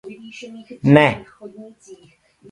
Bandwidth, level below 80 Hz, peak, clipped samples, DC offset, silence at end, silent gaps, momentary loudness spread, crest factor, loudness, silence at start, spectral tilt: 10.5 kHz; -54 dBFS; 0 dBFS; under 0.1%; under 0.1%; 0.6 s; none; 26 LU; 20 dB; -15 LUFS; 0.05 s; -7.5 dB/octave